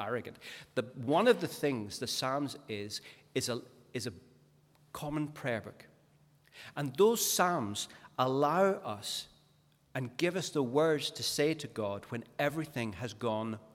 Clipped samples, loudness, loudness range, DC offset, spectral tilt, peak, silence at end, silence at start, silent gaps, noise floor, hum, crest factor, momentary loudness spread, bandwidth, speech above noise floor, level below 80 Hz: under 0.1%; -33 LUFS; 8 LU; under 0.1%; -4 dB/octave; -14 dBFS; 0.1 s; 0 s; none; -68 dBFS; none; 20 dB; 14 LU; 17 kHz; 34 dB; -72 dBFS